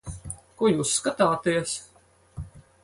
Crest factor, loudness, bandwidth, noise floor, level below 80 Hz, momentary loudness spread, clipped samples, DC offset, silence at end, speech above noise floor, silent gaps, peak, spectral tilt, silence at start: 20 dB; -24 LUFS; 11.5 kHz; -47 dBFS; -50 dBFS; 20 LU; under 0.1%; under 0.1%; 0.25 s; 23 dB; none; -8 dBFS; -4 dB/octave; 0.05 s